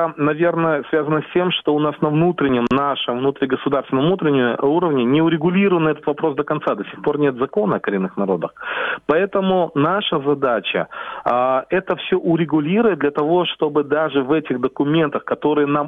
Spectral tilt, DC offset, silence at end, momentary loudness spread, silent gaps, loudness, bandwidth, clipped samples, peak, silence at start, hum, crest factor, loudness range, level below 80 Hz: -9 dB/octave; under 0.1%; 0 s; 5 LU; none; -19 LUFS; 4.1 kHz; under 0.1%; -2 dBFS; 0 s; none; 16 dB; 2 LU; -56 dBFS